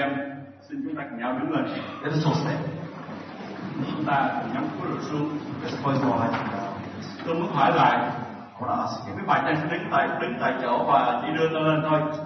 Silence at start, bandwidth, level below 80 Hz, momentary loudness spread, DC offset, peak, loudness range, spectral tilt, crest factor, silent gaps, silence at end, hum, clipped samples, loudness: 0 s; 6.4 kHz; -68 dBFS; 14 LU; under 0.1%; -6 dBFS; 5 LU; -7 dB/octave; 20 dB; none; 0 s; none; under 0.1%; -26 LUFS